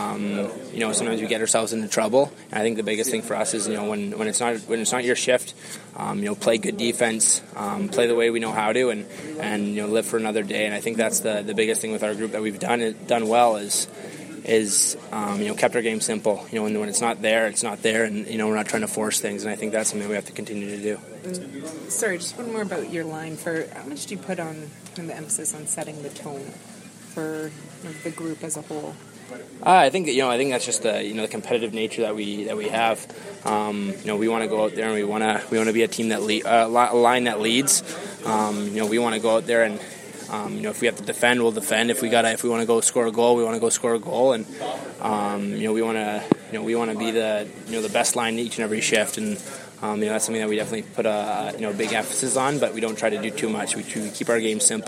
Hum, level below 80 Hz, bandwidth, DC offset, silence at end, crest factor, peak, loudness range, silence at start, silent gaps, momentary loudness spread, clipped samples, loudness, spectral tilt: none; -72 dBFS; 16 kHz; under 0.1%; 0 s; 22 dB; -2 dBFS; 8 LU; 0 s; none; 13 LU; under 0.1%; -23 LUFS; -3 dB/octave